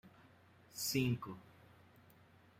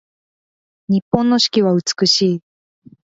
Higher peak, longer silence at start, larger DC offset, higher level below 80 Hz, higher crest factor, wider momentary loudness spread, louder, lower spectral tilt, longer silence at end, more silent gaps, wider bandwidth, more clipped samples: second, -22 dBFS vs 0 dBFS; second, 0.05 s vs 0.9 s; neither; second, -72 dBFS vs -54 dBFS; about the same, 22 dB vs 18 dB; first, 17 LU vs 7 LU; second, -39 LUFS vs -16 LUFS; about the same, -4.5 dB/octave vs -4.5 dB/octave; first, 1.2 s vs 0.7 s; second, none vs 1.02-1.12 s; first, 16 kHz vs 7.8 kHz; neither